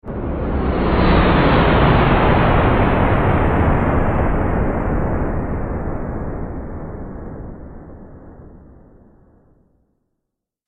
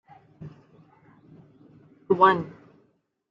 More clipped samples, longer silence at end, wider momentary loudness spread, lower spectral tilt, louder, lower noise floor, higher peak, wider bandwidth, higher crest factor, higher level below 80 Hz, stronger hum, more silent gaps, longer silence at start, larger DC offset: neither; first, 2.1 s vs 0.8 s; second, 18 LU vs 27 LU; first, -9.5 dB/octave vs -4 dB/octave; first, -17 LUFS vs -21 LUFS; first, -79 dBFS vs -68 dBFS; about the same, -2 dBFS vs -4 dBFS; second, 4.9 kHz vs 5.6 kHz; second, 16 dB vs 24 dB; first, -24 dBFS vs -70 dBFS; neither; neither; second, 0.05 s vs 0.4 s; neither